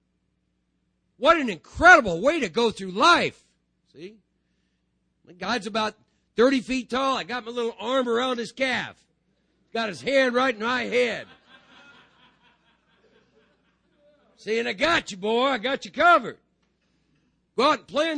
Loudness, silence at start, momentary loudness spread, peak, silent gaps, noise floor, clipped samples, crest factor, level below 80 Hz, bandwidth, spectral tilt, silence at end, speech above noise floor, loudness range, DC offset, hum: -22 LUFS; 1.2 s; 12 LU; -2 dBFS; none; -73 dBFS; under 0.1%; 24 dB; -54 dBFS; 10 kHz; -3.5 dB/octave; 0 s; 50 dB; 10 LU; under 0.1%; none